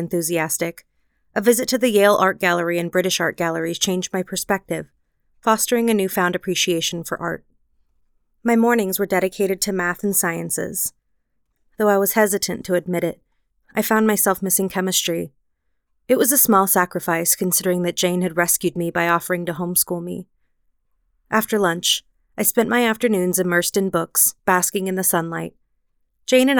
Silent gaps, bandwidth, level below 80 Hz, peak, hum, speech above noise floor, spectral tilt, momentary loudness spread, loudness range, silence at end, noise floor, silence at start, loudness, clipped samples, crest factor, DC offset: none; over 20 kHz; -58 dBFS; -2 dBFS; none; 53 dB; -3.5 dB/octave; 9 LU; 4 LU; 0 s; -72 dBFS; 0 s; -19 LUFS; under 0.1%; 18 dB; under 0.1%